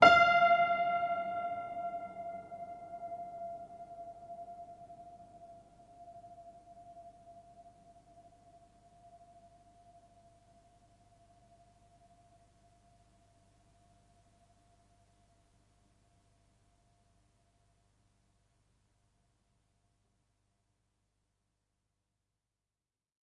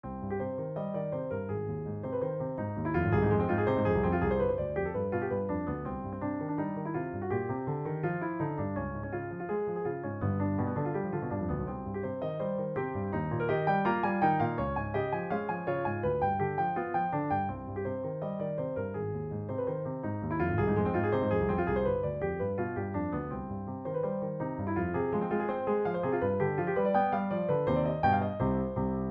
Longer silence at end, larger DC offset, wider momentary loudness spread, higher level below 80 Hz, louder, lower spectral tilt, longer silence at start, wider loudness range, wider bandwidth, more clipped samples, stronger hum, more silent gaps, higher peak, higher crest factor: first, 16 s vs 0 s; neither; first, 29 LU vs 8 LU; second, -72 dBFS vs -50 dBFS; about the same, -32 LUFS vs -32 LUFS; second, -4 dB/octave vs -11 dB/octave; about the same, 0 s vs 0.05 s; first, 28 LU vs 5 LU; first, 10 kHz vs 5.2 kHz; neither; first, 50 Hz at -70 dBFS vs none; neither; first, -8 dBFS vs -14 dBFS; first, 30 dB vs 16 dB